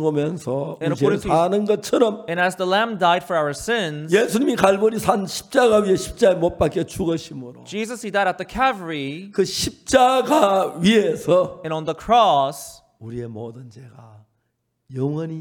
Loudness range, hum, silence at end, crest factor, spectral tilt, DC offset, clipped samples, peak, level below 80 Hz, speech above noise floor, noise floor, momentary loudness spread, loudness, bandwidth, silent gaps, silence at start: 5 LU; none; 0 s; 20 dB; -5 dB/octave; under 0.1%; under 0.1%; 0 dBFS; -48 dBFS; 53 dB; -73 dBFS; 13 LU; -20 LUFS; 19 kHz; none; 0 s